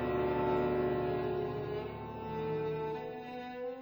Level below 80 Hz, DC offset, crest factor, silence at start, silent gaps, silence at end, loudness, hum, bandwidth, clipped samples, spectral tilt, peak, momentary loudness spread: -54 dBFS; under 0.1%; 14 dB; 0 s; none; 0 s; -36 LUFS; none; over 20 kHz; under 0.1%; -9 dB/octave; -20 dBFS; 11 LU